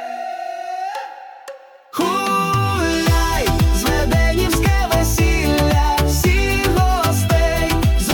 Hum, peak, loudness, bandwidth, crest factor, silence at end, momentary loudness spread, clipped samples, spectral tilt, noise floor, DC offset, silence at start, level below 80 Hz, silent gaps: none; -4 dBFS; -17 LUFS; 19 kHz; 14 dB; 0 s; 11 LU; under 0.1%; -5 dB/octave; -38 dBFS; under 0.1%; 0 s; -22 dBFS; none